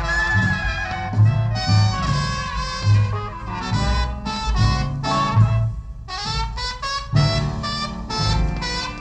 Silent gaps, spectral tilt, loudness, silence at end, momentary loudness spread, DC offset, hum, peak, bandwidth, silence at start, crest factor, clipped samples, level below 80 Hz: none; -5 dB/octave; -21 LUFS; 0 s; 8 LU; under 0.1%; none; -4 dBFS; 8.8 kHz; 0 s; 16 dB; under 0.1%; -28 dBFS